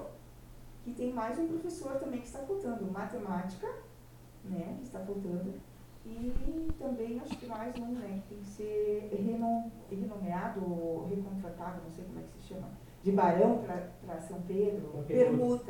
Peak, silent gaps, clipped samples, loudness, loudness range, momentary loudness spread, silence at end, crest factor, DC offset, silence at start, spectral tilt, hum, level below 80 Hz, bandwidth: -14 dBFS; none; under 0.1%; -36 LUFS; 7 LU; 19 LU; 0 s; 22 dB; under 0.1%; 0 s; -7.5 dB/octave; none; -50 dBFS; 19 kHz